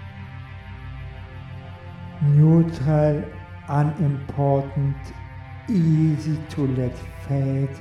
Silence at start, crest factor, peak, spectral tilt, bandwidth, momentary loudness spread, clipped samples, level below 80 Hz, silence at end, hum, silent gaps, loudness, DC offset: 0 s; 16 dB; -8 dBFS; -9.5 dB/octave; 6.6 kHz; 20 LU; under 0.1%; -44 dBFS; 0 s; none; none; -21 LUFS; under 0.1%